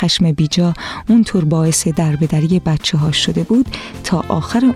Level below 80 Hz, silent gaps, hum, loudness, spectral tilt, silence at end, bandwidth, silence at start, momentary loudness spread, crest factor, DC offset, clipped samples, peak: -38 dBFS; none; none; -15 LUFS; -5 dB/octave; 0 s; 14 kHz; 0 s; 5 LU; 12 dB; under 0.1%; under 0.1%; -2 dBFS